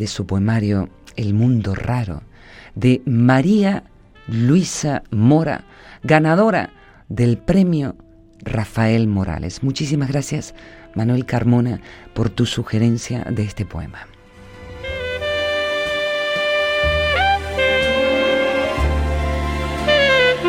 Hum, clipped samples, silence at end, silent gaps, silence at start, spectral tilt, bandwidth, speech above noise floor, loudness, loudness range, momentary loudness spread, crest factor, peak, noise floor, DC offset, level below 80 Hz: none; under 0.1%; 0 s; none; 0 s; -6 dB/octave; 15 kHz; 23 dB; -18 LUFS; 5 LU; 13 LU; 18 dB; 0 dBFS; -41 dBFS; under 0.1%; -34 dBFS